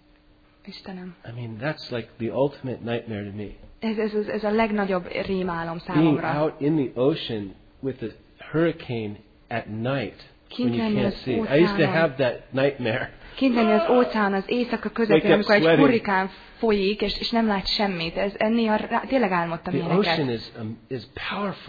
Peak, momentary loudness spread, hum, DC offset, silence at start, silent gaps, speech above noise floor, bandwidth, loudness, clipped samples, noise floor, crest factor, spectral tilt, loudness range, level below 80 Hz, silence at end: -6 dBFS; 16 LU; none; under 0.1%; 0.65 s; none; 33 dB; 5 kHz; -24 LUFS; under 0.1%; -56 dBFS; 18 dB; -8 dB/octave; 9 LU; -50 dBFS; 0 s